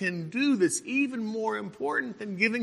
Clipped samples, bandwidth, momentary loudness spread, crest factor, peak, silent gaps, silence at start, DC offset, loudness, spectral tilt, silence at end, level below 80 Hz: under 0.1%; 12.5 kHz; 7 LU; 18 dB; -10 dBFS; none; 0 s; under 0.1%; -28 LUFS; -4 dB/octave; 0 s; -78 dBFS